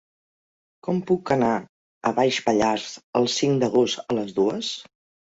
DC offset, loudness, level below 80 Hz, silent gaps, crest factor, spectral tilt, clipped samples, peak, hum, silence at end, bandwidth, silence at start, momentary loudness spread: under 0.1%; -23 LUFS; -60 dBFS; 1.69-2.01 s, 3.04-3.13 s; 18 dB; -5 dB/octave; under 0.1%; -6 dBFS; none; 0.5 s; 8 kHz; 0.85 s; 8 LU